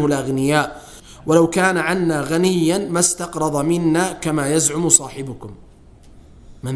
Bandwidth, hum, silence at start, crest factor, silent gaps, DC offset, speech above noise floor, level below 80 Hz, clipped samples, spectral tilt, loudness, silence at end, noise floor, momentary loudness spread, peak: 11 kHz; none; 0 s; 18 dB; none; under 0.1%; 27 dB; -46 dBFS; under 0.1%; -4 dB/octave; -17 LUFS; 0 s; -45 dBFS; 16 LU; 0 dBFS